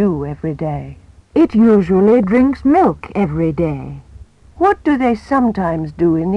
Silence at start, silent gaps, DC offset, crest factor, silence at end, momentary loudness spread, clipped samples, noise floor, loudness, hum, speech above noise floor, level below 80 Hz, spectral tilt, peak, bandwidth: 0 s; none; under 0.1%; 12 dB; 0 s; 12 LU; under 0.1%; -40 dBFS; -15 LUFS; none; 26 dB; -38 dBFS; -9.5 dB/octave; -4 dBFS; 8.8 kHz